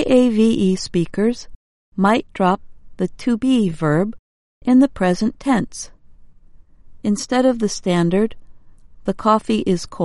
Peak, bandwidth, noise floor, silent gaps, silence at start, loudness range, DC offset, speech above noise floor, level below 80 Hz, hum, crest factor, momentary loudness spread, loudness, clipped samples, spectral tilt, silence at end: -2 dBFS; 11.5 kHz; -44 dBFS; 1.55-1.92 s, 4.19-4.61 s; 0 s; 3 LU; under 0.1%; 27 dB; -44 dBFS; none; 16 dB; 12 LU; -19 LUFS; under 0.1%; -6 dB/octave; 0 s